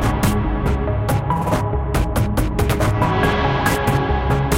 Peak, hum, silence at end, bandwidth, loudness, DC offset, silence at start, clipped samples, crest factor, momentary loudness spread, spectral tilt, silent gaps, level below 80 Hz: -4 dBFS; none; 0 s; 17 kHz; -19 LUFS; under 0.1%; 0 s; under 0.1%; 14 dB; 3 LU; -6 dB/octave; none; -24 dBFS